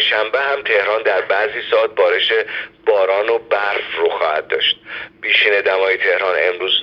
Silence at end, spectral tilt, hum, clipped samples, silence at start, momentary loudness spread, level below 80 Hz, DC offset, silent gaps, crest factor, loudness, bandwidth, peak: 0 s; -3 dB/octave; none; under 0.1%; 0 s; 5 LU; -62 dBFS; under 0.1%; none; 16 dB; -16 LUFS; 6.4 kHz; 0 dBFS